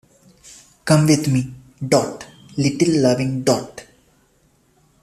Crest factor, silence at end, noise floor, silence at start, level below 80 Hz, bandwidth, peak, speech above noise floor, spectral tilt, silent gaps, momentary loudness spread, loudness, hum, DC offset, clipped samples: 18 dB; 1.2 s; -59 dBFS; 0.45 s; -54 dBFS; 14.5 kHz; -2 dBFS; 42 dB; -5.5 dB/octave; none; 17 LU; -18 LUFS; none; under 0.1%; under 0.1%